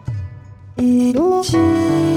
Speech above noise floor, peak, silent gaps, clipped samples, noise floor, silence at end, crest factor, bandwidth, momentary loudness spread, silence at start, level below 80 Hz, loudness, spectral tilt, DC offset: 23 dB; -4 dBFS; none; under 0.1%; -37 dBFS; 0 s; 12 dB; 14 kHz; 16 LU; 0.05 s; -42 dBFS; -15 LUFS; -6.5 dB/octave; under 0.1%